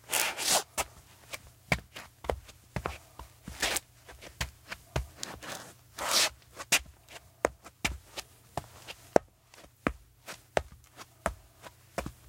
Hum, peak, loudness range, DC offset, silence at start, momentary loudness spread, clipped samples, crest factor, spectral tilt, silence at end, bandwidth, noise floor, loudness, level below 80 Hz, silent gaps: none; -2 dBFS; 6 LU; under 0.1%; 0.05 s; 22 LU; under 0.1%; 34 dB; -2 dB/octave; 0.15 s; 17 kHz; -57 dBFS; -33 LUFS; -50 dBFS; none